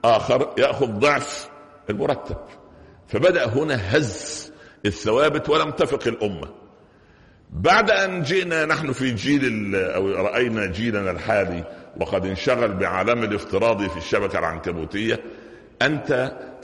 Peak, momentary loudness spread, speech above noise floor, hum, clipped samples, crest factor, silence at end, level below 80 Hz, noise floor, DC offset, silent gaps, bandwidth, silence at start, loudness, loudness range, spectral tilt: -6 dBFS; 12 LU; 30 dB; none; under 0.1%; 18 dB; 0 s; -48 dBFS; -52 dBFS; under 0.1%; none; 11.5 kHz; 0.05 s; -22 LUFS; 3 LU; -5 dB/octave